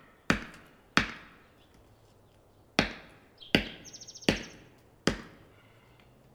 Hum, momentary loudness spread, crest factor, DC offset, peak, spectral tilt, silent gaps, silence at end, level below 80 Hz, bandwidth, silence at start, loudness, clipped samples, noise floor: none; 20 LU; 32 dB; under 0.1%; -2 dBFS; -4 dB/octave; none; 1.05 s; -52 dBFS; over 20 kHz; 0.3 s; -32 LUFS; under 0.1%; -61 dBFS